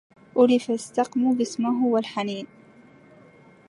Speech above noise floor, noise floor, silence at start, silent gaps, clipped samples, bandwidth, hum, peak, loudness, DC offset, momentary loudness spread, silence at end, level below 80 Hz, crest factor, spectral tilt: 29 dB; -52 dBFS; 0.35 s; none; under 0.1%; 11.5 kHz; none; -6 dBFS; -23 LUFS; under 0.1%; 11 LU; 1.25 s; -74 dBFS; 20 dB; -5 dB/octave